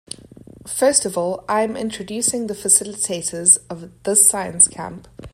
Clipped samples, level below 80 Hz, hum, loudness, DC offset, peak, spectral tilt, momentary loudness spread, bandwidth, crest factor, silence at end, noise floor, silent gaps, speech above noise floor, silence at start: under 0.1%; -54 dBFS; none; -16 LUFS; under 0.1%; 0 dBFS; -2 dB/octave; 17 LU; 16 kHz; 20 dB; 0.05 s; -43 dBFS; none; 23 dB; 0.55 s